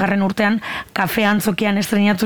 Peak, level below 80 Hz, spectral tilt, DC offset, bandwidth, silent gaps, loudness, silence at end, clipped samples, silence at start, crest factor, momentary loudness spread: -4 dBFS; -50 dBFS; -5 dB/octave; under 0.1%; over 20 kHz; none; -18 LUFS; 0 s; under 0.1%; 0 s; 14 dB; 5 LU